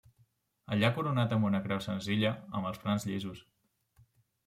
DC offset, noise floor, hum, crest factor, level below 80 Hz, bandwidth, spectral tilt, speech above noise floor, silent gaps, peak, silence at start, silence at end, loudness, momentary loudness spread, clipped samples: under 0.1%; -70 dBFS; none; 20 dB; -68 dBFS; 15 kHz; -6.5 dB/octave; 39 dB; none; -14 dBFS; 0.7 s; 1.05 s; -32 LUFS; 8 LU; under 0.1%